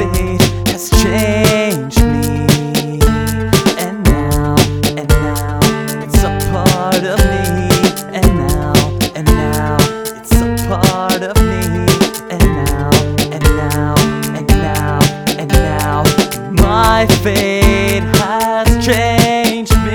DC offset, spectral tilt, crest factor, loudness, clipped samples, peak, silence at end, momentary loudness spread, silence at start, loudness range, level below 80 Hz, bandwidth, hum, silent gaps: 0.1%; -5 dB/octave; 12 dB; -13 LUFS; 0.2%; 0 dBFS; 0 s; 4 LU; 0 s; 2 LU; -18 dBFS; over 20 kHz; none; none